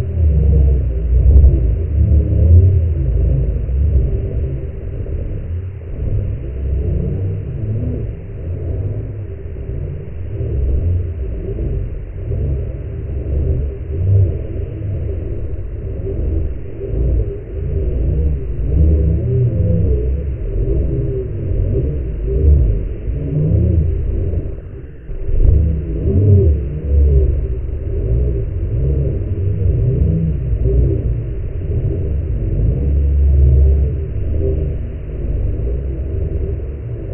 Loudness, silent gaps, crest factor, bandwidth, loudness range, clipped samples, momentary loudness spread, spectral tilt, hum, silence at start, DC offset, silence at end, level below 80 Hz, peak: -18 LUFS; none; 16 dB; 3 kHz; 7 LU; under 0.1%; 12 LU; -13.5 dB/octave; none; 0 s; under 0.1%; 0 s; -18 dBFS; 0 dBFS